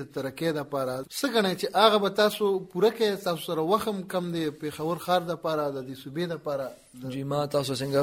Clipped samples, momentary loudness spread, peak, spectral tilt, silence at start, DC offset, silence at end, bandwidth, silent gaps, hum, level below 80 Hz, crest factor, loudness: under 0.1%; 11 LU; -6 dBFS; -5 dB/octave; 0 s; under 0.1%; 0 s; 16.5 kHz; none; none; -66 dBFS; 22 dB; -27 LUFS